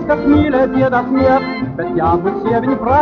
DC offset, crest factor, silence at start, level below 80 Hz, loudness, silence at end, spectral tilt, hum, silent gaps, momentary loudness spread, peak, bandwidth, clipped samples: under 0.1%; 12 dB; 0 s; -38 dBFS; -14 LUFS; 0 s; -6.5 dB/octave; none; none; 6 LU; -2 dBFS; 6.2 kHz; under 0.1%